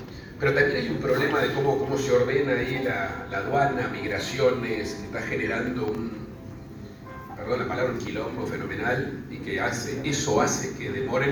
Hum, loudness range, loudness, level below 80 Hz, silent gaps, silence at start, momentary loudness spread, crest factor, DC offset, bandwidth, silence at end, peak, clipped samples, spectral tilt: none; 6 LU; -26 LUFS; -50 dBFS; none; 0 s; 14 LU; 18 dB; under 0.1%; over 20 kHz; 0 s; -8 dBFS; under 0.1%; -5 dB/octave